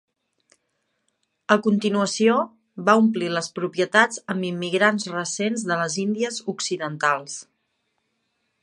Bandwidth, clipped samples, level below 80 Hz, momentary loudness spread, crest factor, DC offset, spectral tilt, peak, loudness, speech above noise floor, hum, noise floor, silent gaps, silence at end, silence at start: 11.5 kHz; under 0.1%; -74 dBFS; 9 LU; 22 dB; under 0.1%; -4 dB/octave; -2 dBFS; -22 LUFS; 52 dB; none; -74 dBFS; none; 1.2 s; 1.5 s